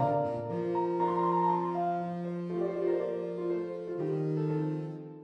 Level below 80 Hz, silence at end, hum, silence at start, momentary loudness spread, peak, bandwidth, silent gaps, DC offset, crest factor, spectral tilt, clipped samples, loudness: -72 dBFS; 0 s; none; 0 s; 7 LU; -18 dBFS; 6.2 kHz; none; under 0.1%; 14 dB; -10 dB/octave; under 0.1%; -32 LUFS